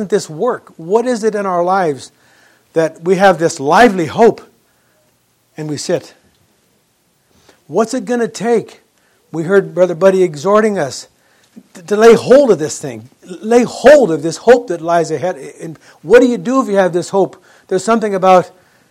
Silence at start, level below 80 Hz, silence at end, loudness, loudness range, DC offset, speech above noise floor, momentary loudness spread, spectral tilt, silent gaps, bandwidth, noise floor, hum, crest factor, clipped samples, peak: 0 s; -52 dBFS; 0.45 s; -13 LUFS; 9 LU; under 0.1%; 46 dB; 17 LU; -5 dB/octave; none; 14 kHz; -58 dBFS; none; 14 dB; 0.6%; 0 dBFS